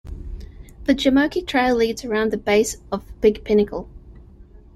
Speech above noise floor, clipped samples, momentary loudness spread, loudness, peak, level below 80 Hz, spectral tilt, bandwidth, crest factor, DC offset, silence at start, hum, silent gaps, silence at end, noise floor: 25 dB; under 0.1%; 17 LU; -20 LUFS; -4 dBFS; -40 dBFS; -4.5 dB/octave; 14 kHz; 18 dB; under 0.1%; 0.05 s; none; none; 0.2 s; -45 dBFS